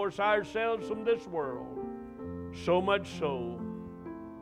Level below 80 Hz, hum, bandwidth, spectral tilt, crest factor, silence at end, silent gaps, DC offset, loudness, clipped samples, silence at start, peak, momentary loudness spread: -60 dBFS; none; 11 kHz; -6 dB/octave; 18 dB; 0 s; none; under 0.1%; -33 LUFS; under 0.1%; 0 s; -14 dBFS; 14 LU